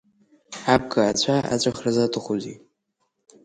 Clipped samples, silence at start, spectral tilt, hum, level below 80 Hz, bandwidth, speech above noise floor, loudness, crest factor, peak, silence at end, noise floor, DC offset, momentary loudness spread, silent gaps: under 0.1%; 0.5 s; -4.5 dB/octave; none; -54 dBFS; 11 kHz; 52 dB; -22 LUFS; 22 dB; -4 dBFS; 0.85 s; -74 dBFS; under 0.1%; 10 LU; none